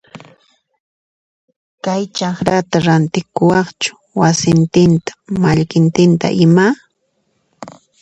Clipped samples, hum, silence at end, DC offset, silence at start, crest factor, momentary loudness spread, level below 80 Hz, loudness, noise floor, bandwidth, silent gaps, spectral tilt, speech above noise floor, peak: under 0.1%; none; 0.3 s; under 0.1%; 0.15 s; 14 dB; 9 LU; -46 dBFS; -14 LUFS; -65 dBFS; 8.2 kHz; 0.80-1.48 s, 1.56-1.78 s; -6 dB/octave; 52 dB; 0 dBFS